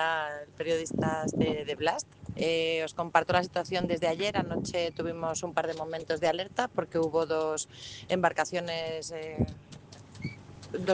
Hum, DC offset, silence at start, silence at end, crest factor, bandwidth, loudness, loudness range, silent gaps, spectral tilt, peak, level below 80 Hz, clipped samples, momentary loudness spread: none; under 0.1%; 0 s; 0 s; 24 dB; 10 kHz; -31 LUFS; 3 LU; none; -4.5 dB/octave; -6 dBFS; -56 dBFS; under 0.1%; 13 LU